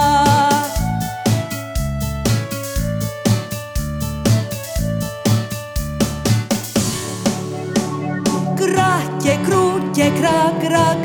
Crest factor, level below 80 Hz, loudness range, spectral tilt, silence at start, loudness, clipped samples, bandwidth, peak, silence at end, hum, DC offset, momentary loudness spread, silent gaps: 16 dB; -32 dBFS; 4 LU; -5 dB/octave; 0 s; -18 LUFS; under 0.1%; over 20 kHz; -2 dBFS; 0 s; none; under 0.1%; 8 LU; none